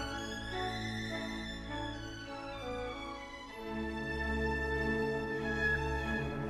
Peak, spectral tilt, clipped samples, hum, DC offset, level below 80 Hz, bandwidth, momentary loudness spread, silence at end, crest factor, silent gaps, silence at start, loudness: -22 dBFS; -5.5 dB/octave; under 0.1%; none; under 0.1%; -46 dBFS; 14 kHz; 10 LU; 0 s; 16 dB; none; 0 s; -37 LUFS